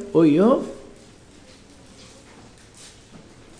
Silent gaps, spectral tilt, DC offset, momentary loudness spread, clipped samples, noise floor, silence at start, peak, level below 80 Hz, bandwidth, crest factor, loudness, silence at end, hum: none; -7.5 dB/octave; under 0.1%; 28 LU; under 0.1%; -48 dBFS; 0 s; -6 dBFS; -54 dBFS; 10.5 kHz; 18 dB; -18 LUFS; 2.8 s; none